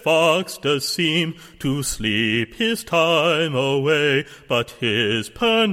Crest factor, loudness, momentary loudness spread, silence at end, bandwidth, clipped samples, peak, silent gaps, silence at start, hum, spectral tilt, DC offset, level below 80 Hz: 16 dB; -20 LUFS; 6 LU; 0 s; 16.5 kHz; under 0.1%; -4 dBFS; none; 0.05 s; none; -4 dB/octave; under 0.1%; -48 dBFS